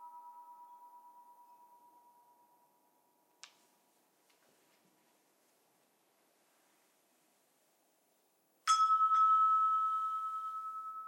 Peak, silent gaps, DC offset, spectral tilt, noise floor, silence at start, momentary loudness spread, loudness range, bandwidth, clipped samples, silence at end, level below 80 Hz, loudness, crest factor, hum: -18 dBFS; none; under 0.1%; 2.5 dB/octave; -75 dBFS; 0 s; 16 LU; 7 LU; 16.5 kHz; under 0.1%; 0 s; under -90 dBFS; -31 LUFS; 20 dB; none